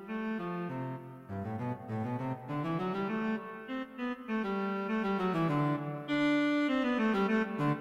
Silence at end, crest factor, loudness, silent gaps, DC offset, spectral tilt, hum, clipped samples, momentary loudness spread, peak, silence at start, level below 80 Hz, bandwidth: 0 s; 14 dB; -33 LUFS; none; under 0.1%; -7.5 dB/octave; none; under 0.1%; 10 LU; -20 dBFS; 0 s; -64 dBFS; 11.5 kHz